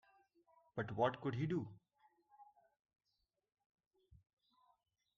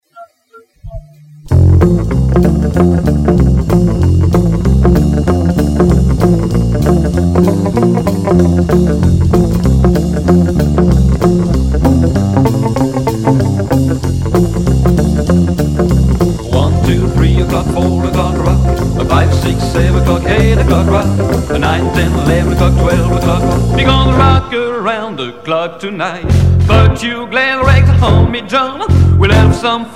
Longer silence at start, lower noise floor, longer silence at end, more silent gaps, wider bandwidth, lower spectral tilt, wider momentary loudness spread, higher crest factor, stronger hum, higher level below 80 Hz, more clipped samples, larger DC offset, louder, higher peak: first, 0.75 s vs 0.15 s; first, -88 dBFS vs -44 dBFS; first, 2.75 s vs 0 s; neither; second, 7.2 kHz vs 16 kHz; about the same, -6 dB/octave vs -7 dB/octave; first, 12 LU vs 5 LU; first, 24 dB vs 10 dB; neither; second, -78 dBFS vs -18 dBFS; second, under 0.1% vs 0.6%; second, under 0.1% vs 1%; second, -42 LUFS vs -11 LUFS; second, -22 dBFS vs 0 dBFS